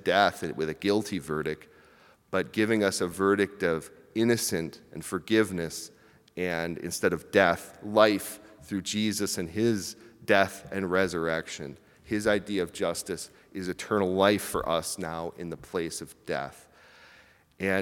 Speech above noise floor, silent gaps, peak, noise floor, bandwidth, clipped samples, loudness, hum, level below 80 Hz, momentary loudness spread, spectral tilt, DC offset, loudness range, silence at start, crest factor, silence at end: 30 dB; none; -4 dBFS; -58 dBFS; 18 kHz; under 0.1%; -28 LUFS; none; -62 dBFS; 15 LU; -4 dB/octave; under 0.1%; 3 LU; 0 s; 24 dB; 0 s